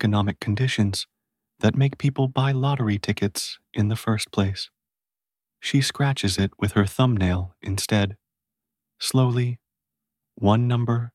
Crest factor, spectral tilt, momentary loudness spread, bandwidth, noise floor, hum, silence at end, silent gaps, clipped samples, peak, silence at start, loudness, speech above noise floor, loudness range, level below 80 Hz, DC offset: 18 dB; -5.5 dB/octave; 8 LU; 14 kHz; under -90 dBFS; none; 0.05 s; none; under 0.1%; -6 dBFS; 0 s; -23 LUFS; over 68 dB; 3 LU; -52 dBFS; under 0.1%